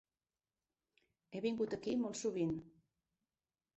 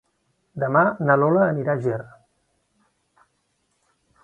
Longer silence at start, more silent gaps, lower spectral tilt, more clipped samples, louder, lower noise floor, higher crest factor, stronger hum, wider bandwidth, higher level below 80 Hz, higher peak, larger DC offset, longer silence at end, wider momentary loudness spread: first, 1.3 s vs 0.55 s; neither; second, -6.5 dB/octave vs -10.5 dB/octave; neither; second, -40 LUFS vs -21 LUFS; first, under -90 dBFS vs -70 dBFS; second, 16 dB vs 22 dB; neither; first, 8 kHz vs 7.2 kHz; second, -74 dBFS vs -66 dBFS; second, -26 dBFS vs -2 dBFS; neither; second, 1.1 s vs 2.15 s; second, 6 LU vs 12 LU